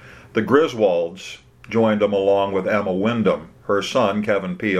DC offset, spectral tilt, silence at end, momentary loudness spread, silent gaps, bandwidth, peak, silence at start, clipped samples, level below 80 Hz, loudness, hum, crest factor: under 0.1%; -6 dB/octave; 0 s; 9 LU; none; 13 kHz; -2 dBFS; 0 s; under 0.1%; -56 dBFS; -20 LUFS; none; 18 dB